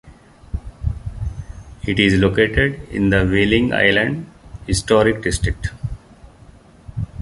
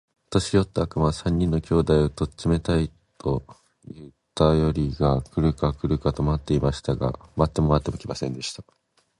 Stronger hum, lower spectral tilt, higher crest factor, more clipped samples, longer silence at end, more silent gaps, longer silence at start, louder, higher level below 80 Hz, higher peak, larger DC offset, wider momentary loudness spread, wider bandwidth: neither; second, -5.5 dB/octave vs -7 dB/octave; about the same, 18 dB vs 22 dB; neither; second, 0 s vs 0.6 s; neither; second, 0.05 s vs 0.3 s; first, -18 LUFS vs -24 LUFS; first, -30 dBFS vs -36 dBFS; about the same, -2 dBFS vs -2 dBFS; neither; first, 18 LU vs 11 LU; about the same, 11.5 kHz vs 11.5 kHz